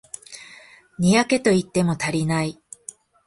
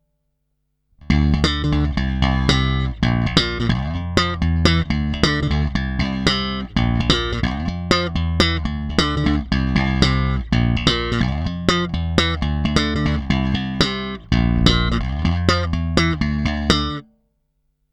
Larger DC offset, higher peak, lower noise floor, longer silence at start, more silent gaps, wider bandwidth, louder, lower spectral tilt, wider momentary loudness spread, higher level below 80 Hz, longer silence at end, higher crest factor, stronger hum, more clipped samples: neither; about the same, -4 dBFS vs -2 dBFS; second, -48 dBFS vs -71 dBFS; second, 0.3 s vs 1.05 s; neither; about the same, 11.5 kHz vs 11 kHz; about the same, -21 LUFS vs -19 LUFS; about the same, -5.5 dB/octave vs -5.5 dB/octave; first, 22 LU vs 5 LU; second, -56 dBFS vs -26 dBFS; second, 0.75 s vs 0.9 s; about the same, 18 dB vs 18 dB; neither; neither